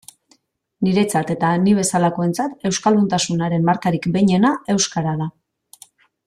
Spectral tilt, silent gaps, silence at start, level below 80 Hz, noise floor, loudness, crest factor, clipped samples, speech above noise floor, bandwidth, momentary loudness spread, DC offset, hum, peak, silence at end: -5 dB/octave; none; 0.8 s; -56 dBFS; -60 dBFS; -18 LUFS; 16 dB; under 0.1%; 42 dB; 14 kHz; 6 LU; under 0.1%; none; -4 dBFS; 0.95 s